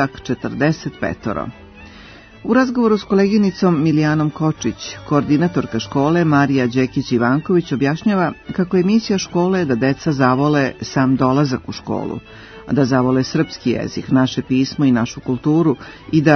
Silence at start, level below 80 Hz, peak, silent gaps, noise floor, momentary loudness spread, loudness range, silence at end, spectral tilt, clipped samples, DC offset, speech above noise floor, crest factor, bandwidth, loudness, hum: 0 s; -48 dBFS; 0 dBFS; none; -40 dBFS; 9 LU; 2 LU; 0 s; -6.5 dB/octave; under 0.1%; under 0.1%; 24 dB; 16 dB; 6.6 kHz; -17 LUFS; none